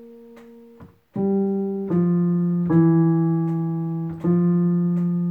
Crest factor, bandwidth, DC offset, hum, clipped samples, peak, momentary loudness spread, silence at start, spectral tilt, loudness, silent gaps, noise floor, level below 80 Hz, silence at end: 14 dB; 2.2 kHz; under 0.1%; none; under 0.1%; -6 dBFS; 8 LU; 0 s; -12.5 dB/octave; -21 LUFS; none; -47 dBFS; -60 dBFS; 0 s